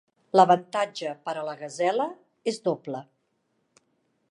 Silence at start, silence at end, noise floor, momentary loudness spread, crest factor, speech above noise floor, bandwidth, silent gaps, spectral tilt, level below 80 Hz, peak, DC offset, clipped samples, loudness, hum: 0.35 s; 1.3 s; -74 dBFS; 14 LU; 22 dB; 48 dB; 11 kHz; none; -5 dB/octave; -82 dBFS; -4 dBFS; under 0.1%; under 0.1%; -26 LUFS; none